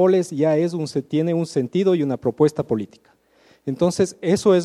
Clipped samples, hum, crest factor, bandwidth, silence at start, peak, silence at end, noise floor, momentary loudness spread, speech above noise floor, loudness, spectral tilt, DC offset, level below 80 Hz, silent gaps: under 0.1%; none; 16 dB; 12.5 kHz; 0 s; -4 dBFS; 0 s; -56 dBFS; 7 LU; 37 dB; -21 LUFS; -6.5 dB/octave; under 0.1%; -60 dBFS; none